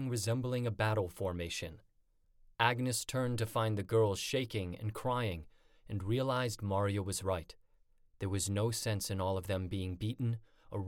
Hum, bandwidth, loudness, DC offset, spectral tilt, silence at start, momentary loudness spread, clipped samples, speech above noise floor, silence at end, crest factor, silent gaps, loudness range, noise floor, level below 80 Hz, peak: none; 17.5 kHz; -36 LUFS; under 0.1%; -5 dB/octave; 0 s; 9 LU; under 0.1%; 35 dB; 0 s; 22 dB; none; 3 LU; -70 dBFS; -58 dBFS; -14 dBFS